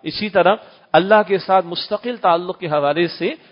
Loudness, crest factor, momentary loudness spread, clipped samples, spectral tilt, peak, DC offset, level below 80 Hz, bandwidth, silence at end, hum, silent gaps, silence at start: -18 LUFS; 18 dB; 9 LU; under 0.1%; -10 dB/octave; 0 dBFS; under 0.1%; -60 dBFS; 5.4 kHz; 0.15 s; none; none; 0.05 s